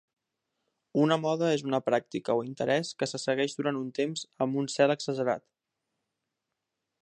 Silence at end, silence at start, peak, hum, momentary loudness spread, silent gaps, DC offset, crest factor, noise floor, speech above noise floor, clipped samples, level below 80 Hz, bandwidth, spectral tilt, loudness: 1.6 s; 0.95 s; -10 dBFS; none; 6 LU; none; under 0.1%; 20 dB; -85 dBFS; 57 dB; under 0.1%; -78 dBFS; 10.5 kHz; -5 dB/octave; -29 LUFS